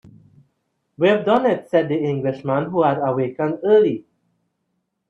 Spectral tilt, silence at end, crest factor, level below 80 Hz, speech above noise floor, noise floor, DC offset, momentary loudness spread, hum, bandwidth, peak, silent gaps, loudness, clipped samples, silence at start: -8.5 dB/octave; 1.1 s; 18 dB; -64 dBFS; 55 dB; -73 dBFS; under 0.1%; 7 LU; none; 6.8 kHz; -2 dBFS; none; -19 LUFS; under 0.1%; 1 s